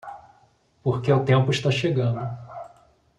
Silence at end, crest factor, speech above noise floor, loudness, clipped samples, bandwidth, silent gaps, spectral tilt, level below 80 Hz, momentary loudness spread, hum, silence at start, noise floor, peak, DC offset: 0.5 s; 18 dB; 39 dB; -23 LUFS; under 0.1%; 9.2 kHz; none; -6.5 dB/octave; -58 dBFS; 20 LU; none; 0.05 s; -60 dBFS; -6 dBFS; under 0.1%